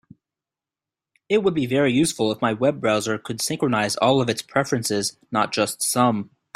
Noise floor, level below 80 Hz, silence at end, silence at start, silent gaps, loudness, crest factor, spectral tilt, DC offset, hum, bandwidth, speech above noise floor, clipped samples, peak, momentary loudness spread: -89 dBFS; -60 dBFS; 0.3 s; 1.3 s; none; -22 LUFS; 18 dB; -4 dB/octave; under 0.1%; none; 16 kHz; 68 dB; under 0.1%; -4 dBFS; 6 LU